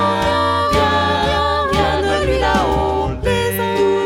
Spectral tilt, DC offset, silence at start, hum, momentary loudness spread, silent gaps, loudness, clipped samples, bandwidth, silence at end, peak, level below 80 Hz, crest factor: -5 dB/octave; under 0.1%; 0 s; none; 3 LU; none; -16 LUFS; under 0.1%; 16.5 kHz; 0 s; -2 dBFS; -28 dBFS; 14 dB